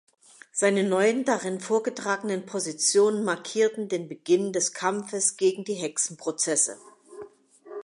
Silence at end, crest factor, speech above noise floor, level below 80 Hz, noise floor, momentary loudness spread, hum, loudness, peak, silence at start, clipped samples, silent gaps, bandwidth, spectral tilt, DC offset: 0 s; 18 dB; 23 dB; -80 dBFS; -49 dBFS; 9 LU; none; -25 LUFS; -8 dBFS; 0.55 s; under 0.1%; none; 11.5 kHz; -3 dB/octave; under 0.1%